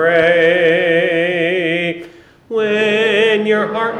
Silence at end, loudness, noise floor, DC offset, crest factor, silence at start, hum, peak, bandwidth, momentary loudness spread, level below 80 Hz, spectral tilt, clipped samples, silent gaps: 0 s; -14 LUFS; -38 dBFS; under 0.1%; 12 dB; 0 s; none; -2 dBFS; 9.4 kHz; 8 LU; -58 dBFS; -5.5 dB/octave; under 0.1%; none